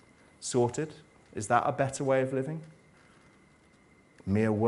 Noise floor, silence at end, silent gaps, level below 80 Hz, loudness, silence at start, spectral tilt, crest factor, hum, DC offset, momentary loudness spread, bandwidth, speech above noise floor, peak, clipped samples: -61 dBFS; 0 s; none; -66 dBFS; -30 LUFS; 0.4 s; -6 dB/octave; 22 dB; none; under 0.1%; 13 LU; 11.5 kHz; 32 dB; -10 dBFS; under 0.1%